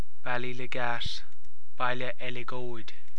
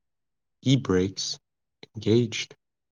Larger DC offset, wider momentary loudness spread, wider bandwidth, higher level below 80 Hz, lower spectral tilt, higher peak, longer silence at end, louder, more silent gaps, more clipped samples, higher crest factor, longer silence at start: first, 10% vs under 0.1%; second, 9 LU vs 15 LU; first, 11 kHz vs 9.8 kHz; first, -54 dBFS vs -68 dBFS; about the same, -5 dB/octave vs -5.5 dB/octave; second, -12 dBFS vs -8 dBFS; second, 0 s vs 0.45 s; second, -34 LUFS vs -26 LUFS; neither; neither; about the same, 20 dB vs 18 dB; second, 0.25 s vs 0.65 s